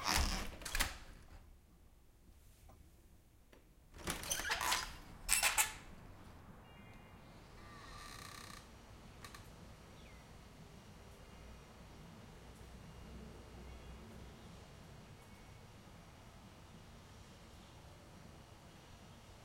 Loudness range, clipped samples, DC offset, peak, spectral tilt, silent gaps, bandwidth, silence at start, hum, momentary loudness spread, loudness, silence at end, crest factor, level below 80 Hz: 20 LU; under 0.1%; under 0.1%; -10 dBFS; -1.5 dB/octave; none; 16.5 kHz; 0 s; none; 22 LU; -39 LUFS; 0 s; 36 dB; -54 dBFS